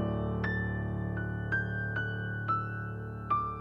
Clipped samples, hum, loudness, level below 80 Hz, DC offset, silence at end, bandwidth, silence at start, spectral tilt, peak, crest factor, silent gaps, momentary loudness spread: under 0.1%; none; -34 LUFS; -46 dBFS; under 0.1%; 0 s; 5.8 kHz; 0 s; -9 dB/octave; -20 dBFS; 14 dB; none; 5 LU